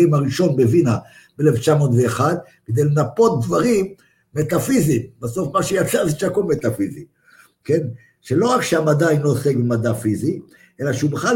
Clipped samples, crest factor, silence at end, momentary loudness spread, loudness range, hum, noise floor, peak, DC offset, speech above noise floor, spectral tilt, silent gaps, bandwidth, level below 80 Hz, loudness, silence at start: under 0.1%; 16 dB; 0 s; 10 LU; 3 LU; none; -52 dBFS; -2 dBFS; under 0.1%; 35 dB; -6.5 dB/octave; none; 17 kHz; -52 dBFS; -19 LUFS; 0 s